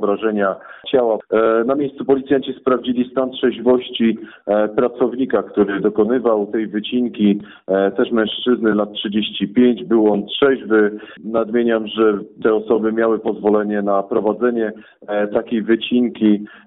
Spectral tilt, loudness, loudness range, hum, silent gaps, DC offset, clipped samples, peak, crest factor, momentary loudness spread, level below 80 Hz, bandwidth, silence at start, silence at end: -4.5 dB/octave; -18 LUFS; 2 LU; none; none; under 0.1%; under 0.1%; -4 dBFS; 12 dB; 5 LU; -58 dBFS; 4 kHz; 0 s; 0.1 s